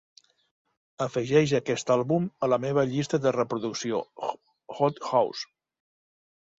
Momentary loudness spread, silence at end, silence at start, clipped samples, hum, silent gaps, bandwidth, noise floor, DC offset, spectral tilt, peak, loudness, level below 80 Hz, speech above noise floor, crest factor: 11 LU; 1.15 s; 1 s; under 0.1%; none; none; 7.8 kHz; under -90 dBFS; under 0.1%; -5.5 dB/octave; -8 dBFS; -27 LUFS; -66 dBFS; over 64 dB; 20 dB